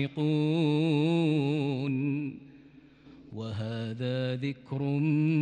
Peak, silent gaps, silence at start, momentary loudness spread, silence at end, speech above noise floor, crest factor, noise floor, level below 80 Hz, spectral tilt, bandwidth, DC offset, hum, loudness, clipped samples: -16 dBFS; none; 0 s; 11 LU; 0 s; 27 dB; 12 dB; -55 dBFS; -70 dBFS; -8.5 dB/octave; 9 kHz; under 0.1%; none; -29 LUFS; under 0.1%